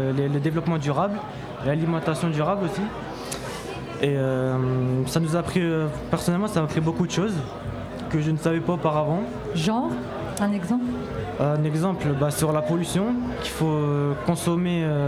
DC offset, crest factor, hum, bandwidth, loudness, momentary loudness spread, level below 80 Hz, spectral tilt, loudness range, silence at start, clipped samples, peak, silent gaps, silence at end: under 0.1%; 16 dB; none; 15 kHz; -25 LUFS; 8 LU; -46 dBFS; -6.5 dB/octave; 2 LU; 0 s; under 0.1%; -8 dBFS; none; 0 s